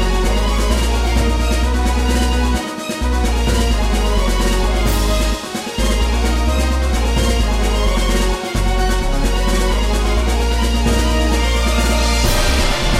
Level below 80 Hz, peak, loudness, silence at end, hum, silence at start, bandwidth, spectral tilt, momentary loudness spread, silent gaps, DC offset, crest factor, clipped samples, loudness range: -16 dBFS; -2 dBFS; -17 LUFS; 0 s; none; 0 s; 16 kHz; -4.5 dB/octave; 3 LU; none; under 0.1%; 12 dB; under 0.1%; 1 LU